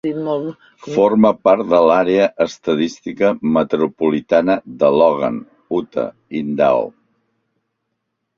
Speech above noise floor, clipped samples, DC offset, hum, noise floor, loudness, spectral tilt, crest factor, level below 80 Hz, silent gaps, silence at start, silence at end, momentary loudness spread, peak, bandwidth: 58 dB; under 0.1%; under 0.1%; none; -74 dBFS; -16 LUFS; -6.5 dB/octave; 16 dB; -58 dBFS; none; 0.05 s; 1.5 s; 11 LU; 0 dBFS; 7.4 kHz